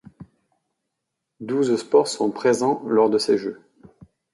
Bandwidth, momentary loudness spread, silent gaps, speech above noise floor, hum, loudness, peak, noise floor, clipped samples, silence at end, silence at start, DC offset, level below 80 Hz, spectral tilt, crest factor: 11.5 kHz; 8 LU; none; 60 dB; none; -21 LUFS; -4 dBFS; -81 dBFS; under 0.1%; 0.8 s; 0.2 s; under 0.1%; -66 dBFS; -4.5 dB/octave; 18 dB